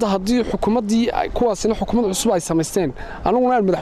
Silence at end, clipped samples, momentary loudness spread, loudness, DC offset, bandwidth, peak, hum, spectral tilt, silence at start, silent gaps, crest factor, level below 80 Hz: 0 s; under 0.1%; 4 LU; -19 LUFS; under 0.1%; 13.5 kHz; -6 dBFS; none; -5 dB/octave; 0 s; none; 14 dB; -36 dBFS